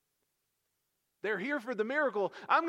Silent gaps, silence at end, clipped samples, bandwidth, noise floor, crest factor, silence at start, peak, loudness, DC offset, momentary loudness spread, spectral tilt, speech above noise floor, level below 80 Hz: none; 0 s; under 0.1%; 13 kHz; -82 dBFS; 20 dB; 1.25 s; -14 dBFS; -33 LUFS; under 0.1%; 6 LU; -5.5 dB/octave; 50 dB; under -90 dBFS